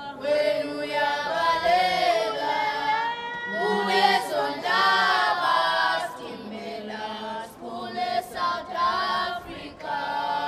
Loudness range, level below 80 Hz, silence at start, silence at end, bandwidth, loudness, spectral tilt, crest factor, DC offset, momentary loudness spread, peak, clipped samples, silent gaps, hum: 6 LU; -60 dBFS; 0 s; 0 s; 15.5 kHz; -24 LUFS; -3 dB/octave; 18 dB; under 0.1%; 14 LU; -8 dBFS; under 0.1%; none; none